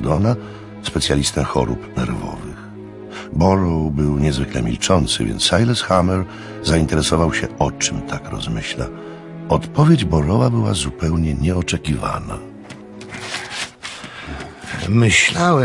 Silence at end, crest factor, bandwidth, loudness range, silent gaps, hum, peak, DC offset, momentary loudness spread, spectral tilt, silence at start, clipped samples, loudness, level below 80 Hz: 0 s; 18 dB; 11.5 kHz; 6 LU; none; none; 0 dBFS; under 0.1%; 17 LU; -5 dB/octave; 0 s; under 0.1%; -18 LUFS; -34 dBFS